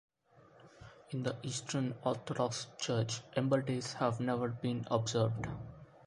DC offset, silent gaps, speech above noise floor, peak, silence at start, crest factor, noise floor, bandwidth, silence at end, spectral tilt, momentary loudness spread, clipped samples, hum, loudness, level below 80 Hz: under 0.1%; none; 28 dB; -16 dBFS; 0.6 s; 20 dB; -64 dBFS; 11.5 kHz; 0.1 s; -5.5 dB/octave; 11 LU; under 0.1%; none; -36 LUFS; -64 dBFS